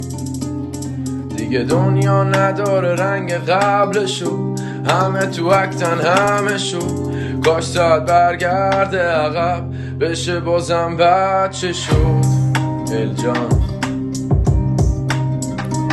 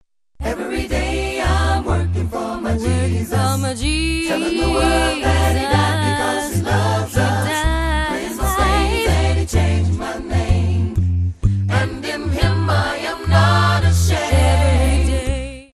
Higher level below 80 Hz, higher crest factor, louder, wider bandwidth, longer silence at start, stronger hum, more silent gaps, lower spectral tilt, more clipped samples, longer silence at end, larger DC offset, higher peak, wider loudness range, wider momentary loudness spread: second, -30 dBFS vs -24 dBFS; about the same, 16 dB vs 16 dB; about the same, -17 LUFS vs -18 LUFS; second, 12.5 kHz vs 14 kHz; second, 0 s vs 0.4 s; neither; neither; about the same, -6 dB/octave vs -5.5 dB/octave; neither; about the same, 0 s vs 0.1 s; second, under 0.1% vs 0.1%; about the same, 0 dBFS vs -2 dBFS; about the same, 2 LU vs 3 LU; about the same, 8 LU vs 7 LU